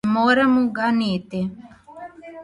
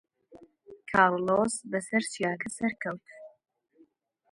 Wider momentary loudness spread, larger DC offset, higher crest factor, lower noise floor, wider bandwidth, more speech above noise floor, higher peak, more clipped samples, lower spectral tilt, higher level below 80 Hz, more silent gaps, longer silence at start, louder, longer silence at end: first, 23 LU vs 13 LU; neither; second, 14 dB vs 24 dB; second, -40 dBFS vs -65 dBFS; about the same, 11 kHz vs 11.5 kHz; second, 21 dB vs 36 dB; about the same, -6 dBFS vs -8 dBFS; neither; first, -6.5 dB/octave vs -4.5 dB/octave; first, -58 dBFS vs -68 dBFS; neither; second, 0.05 s vs 0.3 s; first, -20 LUFS vs -28 LUFS; second, 0 s vs 1.05 s